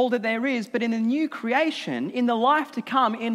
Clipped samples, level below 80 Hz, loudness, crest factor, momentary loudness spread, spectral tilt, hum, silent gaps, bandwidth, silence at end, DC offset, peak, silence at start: under 0.1%; -84 dBFS; -24 LUFS; 16 dB; 5 LU; -5.5 dB/octave; none; none; 12.5 kHz; 0 s; under 0.1%; -8 dBFS; 0 s